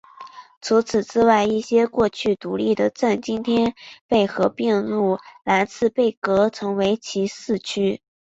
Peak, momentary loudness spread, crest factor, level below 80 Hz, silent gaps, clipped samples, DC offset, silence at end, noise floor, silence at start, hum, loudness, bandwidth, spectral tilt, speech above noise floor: -2 dBFS; 7 LU; 18 dB; -56 dBFS; 0.57-0.61 s, 4.01-4.09 s, 6.17-6.22 s; under 0.1%; under 0.1%; 0.4 s; -42 dBFS; 0.2 s; none; -21 LUFS; 8 kHz; -5.5 dB/octave; 22 dB